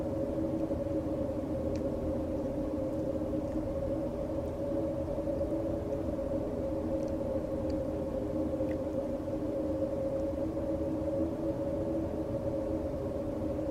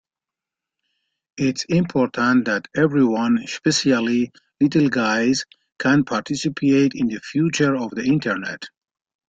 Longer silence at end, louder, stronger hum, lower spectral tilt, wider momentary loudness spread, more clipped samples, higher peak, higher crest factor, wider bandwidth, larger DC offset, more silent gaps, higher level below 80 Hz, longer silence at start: second, 0 s vs 0.6 s; second, -34 LUFS vs -20 LUFS; neither; first, -9 dB/octave vs -5 dB/octave; second, 2 LU vs 7 LU; neither; second, -20 dBFS vs -4 dBFS; about the same, 14 dB vs 16 dB; first, 14.5 kHz vs 8.8 kHz; neither; neither; first, -46 dBFS vs -58 dBFS; second, 0 s vs 1.35 s